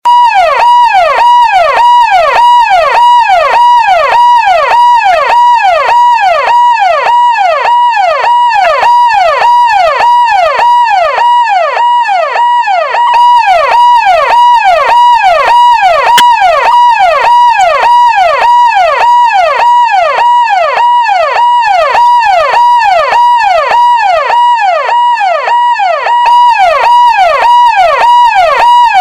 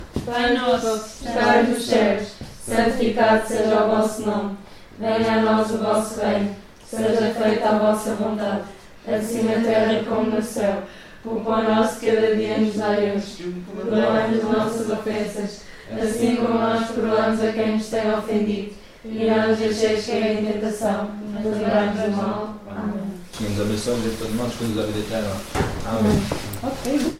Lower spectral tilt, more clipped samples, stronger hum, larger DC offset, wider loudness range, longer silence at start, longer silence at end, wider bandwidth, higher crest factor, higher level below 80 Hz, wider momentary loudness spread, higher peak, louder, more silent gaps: second, -0.5 dB/octave vs -5.5 dB/octave; first, 0.2% vs under 0.1%; neither; first, 0.5% vs under 0.1%; about the same, 2 LU vs 4 LU; about the same, 0.05 s vs 0 s; about the same, 0 s vs 0 s; about the same, 15 kHz vs 15.5 kHz; second, 6 dB vs 18 dB; about the same, -42 dBFS vs -44 dBFS; second, 3 LU vs 11 LU; first, 0 dBFS vs -4 dBFS; first, -5 LUFS vs -22 LUFS; neither